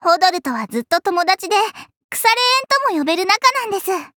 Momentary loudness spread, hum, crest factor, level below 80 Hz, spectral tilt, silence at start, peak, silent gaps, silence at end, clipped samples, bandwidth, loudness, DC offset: 9 LU; none; 16 dB; -68 dBFS; -1 dB/octave; 0 s; 0 dBFS; 1.97-2.09 s; 0.1 s; under 0.1%; over 20 kHz; -16 LUFS; under 0.1%